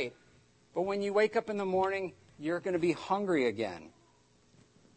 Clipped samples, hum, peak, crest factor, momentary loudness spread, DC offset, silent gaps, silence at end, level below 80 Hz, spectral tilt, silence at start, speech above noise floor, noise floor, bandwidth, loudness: under 0.1%; none; -16 dBFS; 18 dB; 11 LU; under 0.1%; none; 1.1 s; -72 dBFS; -6 dB/octave; 0 s; 35 dB; -66 dBFS; 8.8 kHz; -32 LUFS